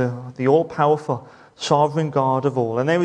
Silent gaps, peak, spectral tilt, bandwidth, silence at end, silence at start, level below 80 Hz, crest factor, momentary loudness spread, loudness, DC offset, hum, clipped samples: none; -4 dBFS; -6.5 dB/octave; 10 kHz; 0 s; 0 s; -64 dBFS; 16 dB; 8 LU; -20 LUFS; under 0.1%; none; under 0.1%